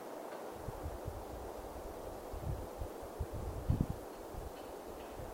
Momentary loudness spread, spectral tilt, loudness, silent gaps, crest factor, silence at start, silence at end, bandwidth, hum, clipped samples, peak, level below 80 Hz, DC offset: 10 LU; -6.5 dB/octave; -44 LUFS; none; 24 dB; 0 s; 0 s; 16 kHz; none; under 0.1%; -18 dBFS; -48 dBFS; under 0.1%